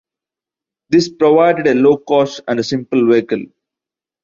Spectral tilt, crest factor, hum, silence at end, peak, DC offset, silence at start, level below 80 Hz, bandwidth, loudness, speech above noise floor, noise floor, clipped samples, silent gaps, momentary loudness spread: -6 dB/octave; 14 dB; none; 0.8 s; -2 dBFS; under 0.1%; 0.9 s; -58 dBFS; 7.6 kHz; -14 LUFS; 74 dB; -87 dBFS; under 0.1%; none; 8 LU